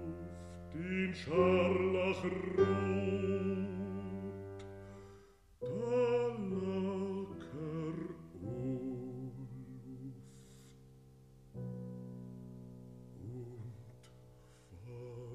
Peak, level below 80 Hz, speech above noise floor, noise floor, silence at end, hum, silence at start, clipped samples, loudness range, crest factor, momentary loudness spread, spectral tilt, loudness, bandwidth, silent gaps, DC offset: -18 dBFS; -64 dBFS; 28 dB; -61 dBFS; 0 s; none; 0 s; under 0.1%; 17 LU; 22 dB; 21 LU; -7.5 dB/octave; -37 LUFS; 10.5 kHz; none; under 0.1%